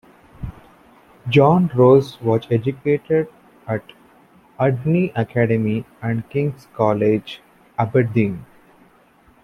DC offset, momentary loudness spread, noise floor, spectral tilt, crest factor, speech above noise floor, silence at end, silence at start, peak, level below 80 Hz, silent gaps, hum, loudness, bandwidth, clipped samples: under 0.1%; 21 LU; -53 dBFS; -9 dB/octave; 18 dB; 36 dB; 1 s; 0.4 s; -2 dBFS; -50 dBFS; none; none; -19 LUFS; 11.5 kHz; under 0.1%